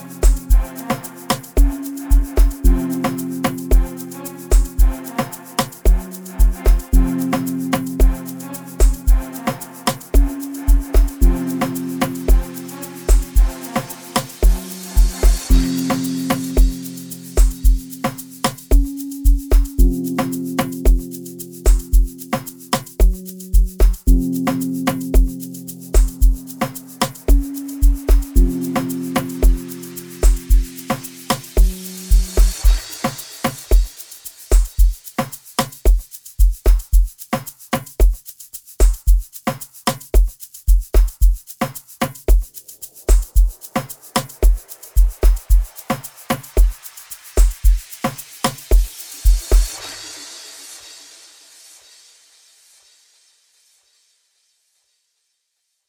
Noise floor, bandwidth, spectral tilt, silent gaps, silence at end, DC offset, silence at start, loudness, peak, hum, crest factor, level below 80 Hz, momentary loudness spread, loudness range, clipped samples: -72 dBFS; over 20 kHz; -5.5 dB/octave; none; 5.1 s; under 0.1%; 0 s; -20 LUFS; -2 dBFS; none; 16 dB; -16 dBFS; 12 LU; 2 LU; under 0.1%